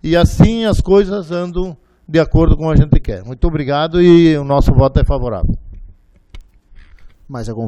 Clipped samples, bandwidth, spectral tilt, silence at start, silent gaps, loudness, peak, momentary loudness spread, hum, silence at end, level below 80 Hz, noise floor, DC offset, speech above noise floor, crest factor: under 0.1%; 13 kHz; -8 dB/octave; 0.05 s; none; -13 LUFS; 0 dBFS; 15 LU; none; 0 s; -20 dBFS; -42 dBFS; under 0.1%; 30 dB; 14 dB